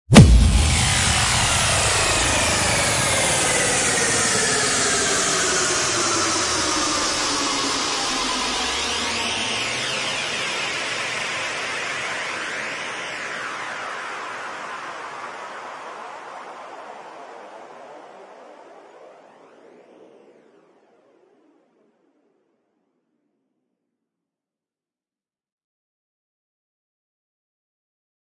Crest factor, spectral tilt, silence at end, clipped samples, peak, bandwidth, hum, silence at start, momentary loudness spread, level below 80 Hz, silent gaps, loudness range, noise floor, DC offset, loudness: 22 dB; -3 dB/octave; 9.2 s; under 0.1%; 0 dBFS; 11.5 kHz; none; 0.1 s; 19 LU; -32 dBFS; none; 19 LU; under -90 dBFS; under 0.1%; -19 LUFS